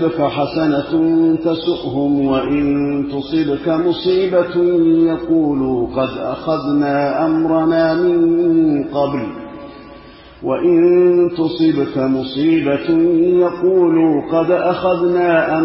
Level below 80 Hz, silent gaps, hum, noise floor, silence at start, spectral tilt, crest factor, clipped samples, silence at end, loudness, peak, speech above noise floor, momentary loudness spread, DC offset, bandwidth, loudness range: -46 dBFS; none; none; -39 dBFS; 0 s; -11.5 dB/octave; 12 dB; under 0.1%; 0 s; -15 LUFS; -2 dBFS; 24 dB; 7 LU; under 0.1%; 5.8 kHz; 2 LU